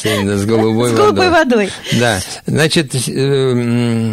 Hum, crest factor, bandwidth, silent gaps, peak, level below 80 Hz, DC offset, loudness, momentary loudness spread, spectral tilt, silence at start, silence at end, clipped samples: none; 12 dB; 16 kHz; none; 0 dBFS; -44 dBFS; 0.2%; -13 LUFS; 5 LU; -5 dB/octave; 0 s; 0 s; under 0.1%